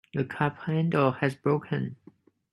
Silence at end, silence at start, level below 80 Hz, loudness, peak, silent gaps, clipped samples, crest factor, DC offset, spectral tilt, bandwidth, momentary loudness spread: 0.6 s; 0.15 s; -66 dBFS; -28 LUFS; -8 dBFS; none; under 0.1%; 20 dB; under 0.1%; -8.5 dB/octave; 11.5 kHz; 8 LU